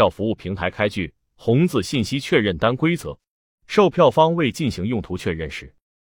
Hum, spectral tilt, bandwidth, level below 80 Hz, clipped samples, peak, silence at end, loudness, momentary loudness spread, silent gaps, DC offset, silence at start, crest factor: none; -6 dB/octave; 17 kHz; -48 dBFS; under 0.1%; -2 dBFS; 0.4 s; -20 LUFS; 13 LU; 3.28-3.58 s; under 0.1%; 0 s; 18 dB